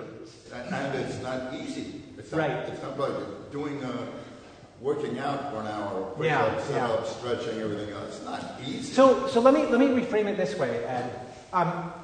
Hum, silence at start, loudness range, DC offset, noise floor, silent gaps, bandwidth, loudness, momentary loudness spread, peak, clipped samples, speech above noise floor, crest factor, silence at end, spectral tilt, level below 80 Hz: none; 0 s; 9 LU; under 0.1%; -48 dBFS; none; 9.6 kHz; -28 LUFS; 16 LU; -6 dBFS; under 0.1%; 21 dB; 22 dB; 0 s; -6 dB/octave; -62 dBFS